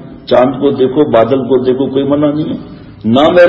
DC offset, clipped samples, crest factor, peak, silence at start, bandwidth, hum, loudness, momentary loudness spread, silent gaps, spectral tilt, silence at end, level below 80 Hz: under 0.1%; 0.3%; 10 dB; 0 dBFS; 0 s; 7.4 kHz; none; -11 LUFS; 11 LU; none; -8 dB/octave; 0 s; -42 dBFS